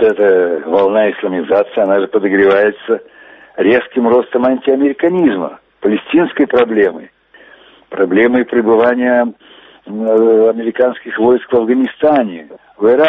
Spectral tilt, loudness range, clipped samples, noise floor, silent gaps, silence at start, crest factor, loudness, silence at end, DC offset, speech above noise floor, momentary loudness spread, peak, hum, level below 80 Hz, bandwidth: -8.5 dB/octave; 2 LU; under 0.1%; -43 dBFS; none; 0 s; 12 dB; -13 LUFS; 0 s; under 0.1%; 31 dB; 9 LU; 0 dBFS; none; -54 dBFS; 4 kHz